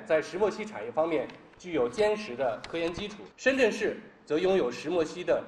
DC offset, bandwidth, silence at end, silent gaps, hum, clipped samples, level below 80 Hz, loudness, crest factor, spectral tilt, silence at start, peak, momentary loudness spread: under 0.1%; 11 kHz; 0 s; none; none; under 0.1%; -60 dBFS; -29 LUFS; 18 dB; -5 dB/octave; 0 s; -12 dBFS; 11 LU